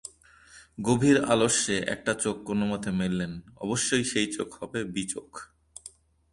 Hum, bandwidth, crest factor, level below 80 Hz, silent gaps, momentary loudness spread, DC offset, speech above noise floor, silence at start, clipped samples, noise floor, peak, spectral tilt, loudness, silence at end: none; 11.5 kHz; 20 dB; -56 dBFS; none; 23 LU; under 0.1%; 28 dB; 0.05 s; under 0.1%; -55 dBFS; -8 dBFS; -4 dB/octave; -27 LUFS; 0.45 s